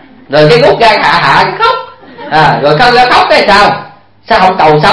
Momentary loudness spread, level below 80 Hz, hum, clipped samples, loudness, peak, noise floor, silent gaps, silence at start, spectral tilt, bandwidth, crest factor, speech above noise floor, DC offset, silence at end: 7 LU; -34 dBFS; none; 4%; -6 LUFS; 0 dBFS; -26 dBFS; none; 0.3 s; -5 dB/octave; 11 kHz; 6 dB; 20 dB; under 0.1%; 0 s